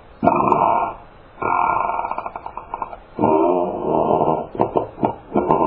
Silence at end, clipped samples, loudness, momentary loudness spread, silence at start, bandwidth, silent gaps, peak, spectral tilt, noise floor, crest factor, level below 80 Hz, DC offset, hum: 0 s; under 0.1%; -20 LUFS; 14 LU; 0.1 s; 4.7 kHz; none; 0 dBFS; -10.5 dB/octave; -40 dBFS; 20 dB; -48 dBFS; under 0.1%; none